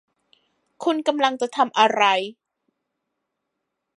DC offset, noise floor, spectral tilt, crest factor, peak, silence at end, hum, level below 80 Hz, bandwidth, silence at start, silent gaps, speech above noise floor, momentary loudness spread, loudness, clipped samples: under 0.1%; -80 dBFS; -3 dB/octave; 22 dB; -2 dBFS; 1.65 s; none; -84 dBFS; 11.5 kHz; 0.8 s; none; 59 dB; 9 LU; -20 LUFS; under 0.1%